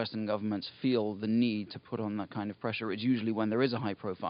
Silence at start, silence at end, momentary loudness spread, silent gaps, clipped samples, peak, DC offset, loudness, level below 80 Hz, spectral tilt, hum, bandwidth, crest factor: 0 s; 0 s; 7 LU; none; under 0.1%; -14 dBFS; under 0.1%; -33 LUFS; -76 dBFS; -5 dB/octave; none; 5.4 kHz; 18 dB